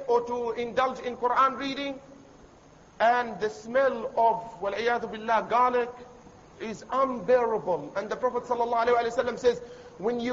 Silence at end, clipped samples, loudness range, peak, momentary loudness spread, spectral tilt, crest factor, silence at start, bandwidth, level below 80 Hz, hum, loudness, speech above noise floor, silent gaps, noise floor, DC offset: 0 s; under 0.1%; 2 LU; -12 dBFS; 10 LU; -4.5 dB/octave; 16 dB; 0 s; 7.8 kHz; -60 dBFS; none; -27 LUFS; 27 dB; none; -54 dBFS; under 0.1%